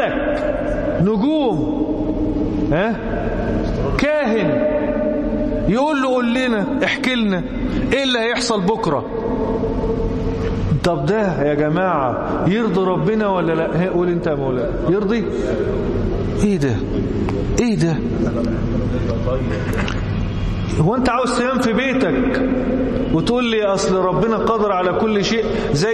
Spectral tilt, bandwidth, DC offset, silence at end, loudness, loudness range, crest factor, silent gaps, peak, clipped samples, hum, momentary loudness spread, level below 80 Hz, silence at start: -6.5 dB/octave; 12.5 kHz; under 0.1%; 0 s; -19 LUFS; 2 LU; 12 dB; none; -6 dBFS; under 0.1%; none; 4 LU; -30 dBFS; 0 s